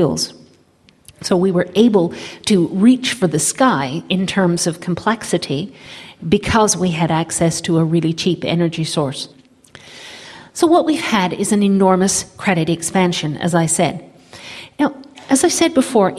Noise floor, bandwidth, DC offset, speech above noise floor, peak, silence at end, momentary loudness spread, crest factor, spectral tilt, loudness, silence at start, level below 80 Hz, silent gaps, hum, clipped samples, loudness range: -52 dBFS; 14.5 kHz; under 0.1%; 37 dB; 0 dBFS; 0 s; 17 LU; 16 dB; -4.5 dB/octave; -16 LUFS; 0 s; -48 dBFS; none; none; under 0.1%; 3 LU